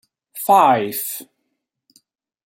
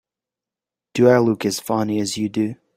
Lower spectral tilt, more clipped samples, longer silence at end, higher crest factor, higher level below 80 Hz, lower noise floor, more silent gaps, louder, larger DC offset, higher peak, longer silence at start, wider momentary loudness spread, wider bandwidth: second, -3.5 dB/octave vs -5.5 dB/octave; neither; first, 1.2 s vs 0.25 s; about the same, 18 dB vs 18 dB; second, -70 dBFS vs -62 dBFS; second, -75 dBFS vs -88 dBFS; neither; about the same, -17 LUFS vs -19 LUFS; neither; about the same, -2 dBFS vs -2 dBFS; second, 0.35 s vs 0.95 s; first, 18 LU vs 9 LU; about the same, 16.5 kHz vs 16 kHz